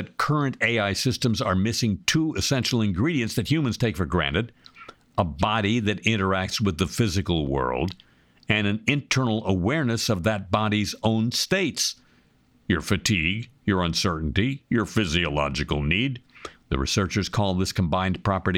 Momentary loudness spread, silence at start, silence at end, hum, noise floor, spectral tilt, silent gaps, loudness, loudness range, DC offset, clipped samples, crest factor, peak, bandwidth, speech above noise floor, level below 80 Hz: 5 LU; 0 s; 0 s; none; -60 dBFS; -4.5 dB/octave; none; -24 LUFS; 2 LU; under 0.1%; under 0.1%; 20 dB; -6 dBFS; 17 kHz; 36 dB; -42 dBFS